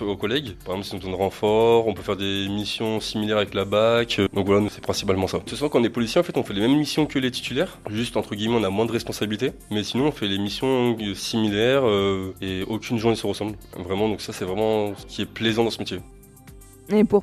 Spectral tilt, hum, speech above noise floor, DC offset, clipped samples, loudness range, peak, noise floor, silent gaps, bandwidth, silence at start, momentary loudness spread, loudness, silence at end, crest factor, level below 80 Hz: -5.5 dB/octave; none; 23 dB; under 0.1%; under 0.1%; 3 LU; -6 dBFS; -46 dBFS; none; 14 kHz; 0 s; 10 LU; -23 LUFS; 0 s; 18 dB; -50 dBFS